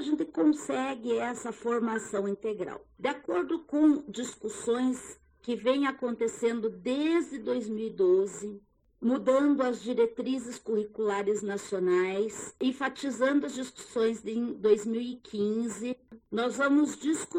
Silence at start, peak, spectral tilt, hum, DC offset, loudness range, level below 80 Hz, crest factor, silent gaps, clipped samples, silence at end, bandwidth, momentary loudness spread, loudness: 0 s; -12 dBFS; -4.5 dB/octave; none; under 0.1%; 2 LU; -68 dBFS; 18 dB; none; under 0.1%; 0 s; 11.5 kHz; 11 LU; -30 LUFS